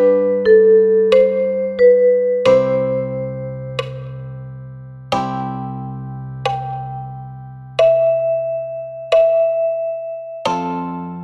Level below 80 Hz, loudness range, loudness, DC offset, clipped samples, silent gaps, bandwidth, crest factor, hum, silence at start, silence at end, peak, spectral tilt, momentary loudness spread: -52 dBFS; 12 LU; -16 LUFS; under 0.1%; under 0.1%; none; 8.2 kHz; 16 dB; none; 0 s; 0 s; -2 dBFS; -7 dB/octave; 19 LU